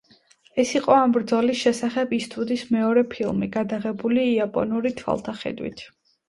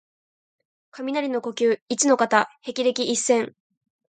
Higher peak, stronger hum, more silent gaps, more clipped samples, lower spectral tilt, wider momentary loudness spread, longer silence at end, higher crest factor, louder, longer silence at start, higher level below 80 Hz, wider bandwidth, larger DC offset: about the same, -4 dBFS vs -4 dBFS; neither; second, none vs 1.82-1.86 s; neither; first, -5.5 dB/octave vs -2 dB/octave; about the same, 11 LU vs 9 LU; second, 0.4 s vs 0.65 s; about the same, 20 dB vs 20 dB; about the same, -23 LUFS vs -22 LUFS; second, 0.55 s vs 0.95 s; first, -58 dBFS vs -76 dBFS; first, 11.5 kHz vs 9.6 kHz; neither